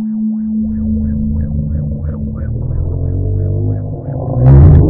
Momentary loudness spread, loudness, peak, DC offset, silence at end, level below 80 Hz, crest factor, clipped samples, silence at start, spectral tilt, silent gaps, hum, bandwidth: 11 LU; -15 LUFS; 0 dBFS; under 0.1%; 0 s; -20 dBFS; 12 dB; 0.9%; 0 s; -14 dB/octave; none; none; 2.2 kHz